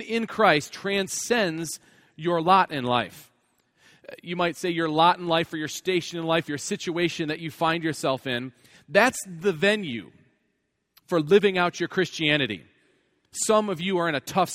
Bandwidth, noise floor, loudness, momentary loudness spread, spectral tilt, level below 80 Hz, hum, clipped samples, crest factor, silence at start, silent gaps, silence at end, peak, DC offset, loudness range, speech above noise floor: 16 kHz; -75 dBFS; -24 LUFS; 11 LU; -4 dB/octave; -66 dBFS; none; under 0.1%; 22 dB; 0 s; none; 0 s; -4 dBFS; under 0.1%; 2 LU; 51 dB